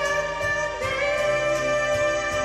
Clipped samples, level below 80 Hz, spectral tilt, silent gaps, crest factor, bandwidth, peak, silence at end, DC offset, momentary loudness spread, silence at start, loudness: under 0.1%; -46 dBFS; -3 dB/octave; none; 12 dB; 13.5 kHz; -10 dBFS; 0 s; under 0.1%; 2 LU; 0 s; -23 LUFS